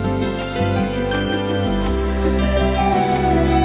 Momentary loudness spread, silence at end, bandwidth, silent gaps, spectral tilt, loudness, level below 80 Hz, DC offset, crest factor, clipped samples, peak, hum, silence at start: 4 LU; 0 s; 4 kHz; none; -11 dB/octave; -19 LUFS; -26 dBFS; under 0.1%; 12 dB; under 0.1%; -6 dBFS; none; 0 s